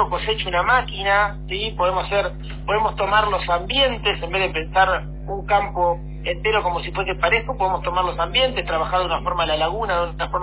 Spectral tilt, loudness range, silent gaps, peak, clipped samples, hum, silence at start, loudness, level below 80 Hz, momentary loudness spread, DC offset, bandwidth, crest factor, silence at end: -8 dB/octave; 1 LU; none; -4 dBFS; under 0.1%; none; 0 s; -21 LUFS; -32 dBFS; 6 LU; under 0.1%; 4 kHz; 18 dB; 0 s